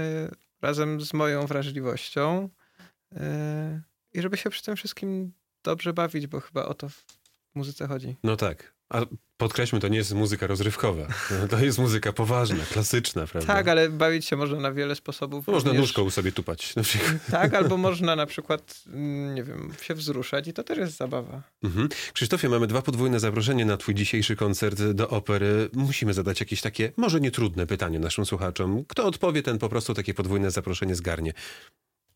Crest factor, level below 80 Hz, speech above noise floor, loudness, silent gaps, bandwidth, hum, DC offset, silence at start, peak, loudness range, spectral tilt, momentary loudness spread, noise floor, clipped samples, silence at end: 20 dB; -50 dBFS; 31 dB; -27 LUFS; none; 17 kHz; none; under 0.1%; 0 s; -6 dBFS; 7 LU; -5 dB/octave; 10 LU; -58 dBFS; under 0.1%; 0.5 s